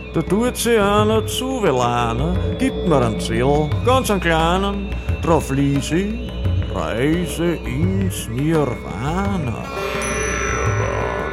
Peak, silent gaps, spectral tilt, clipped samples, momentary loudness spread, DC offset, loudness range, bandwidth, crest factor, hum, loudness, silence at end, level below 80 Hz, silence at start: -2 dBFS; none; -5.5 dB/octave; under 0.1%; 6 LU; under 0.1%; 3 LU; 16 kHz; 16 dB; none; -19 LUFS; 0 s; -30 dBFS; 0 s